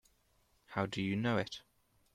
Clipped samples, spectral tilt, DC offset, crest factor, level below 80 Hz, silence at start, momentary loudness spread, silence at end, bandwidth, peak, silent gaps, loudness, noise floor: under 0.1%; -6 dB/octave; under 0.1%; 20 dB; -68 dBFS; 0.7 s; 10 LU; 0.55 s; 14 kHz; -20 dBFS; none; -37 LUFS; -73 dBFS